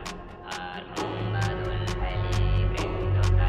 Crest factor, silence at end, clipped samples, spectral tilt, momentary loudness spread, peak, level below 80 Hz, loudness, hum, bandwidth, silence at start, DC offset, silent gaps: 14 dB; 0 s; under 0.1%; -6 dB/octave; 10 LU; -12 dBFS; -32 dBFS; -29 LUFS; none; 10.5 kHz; 0 s; under 0.1%; none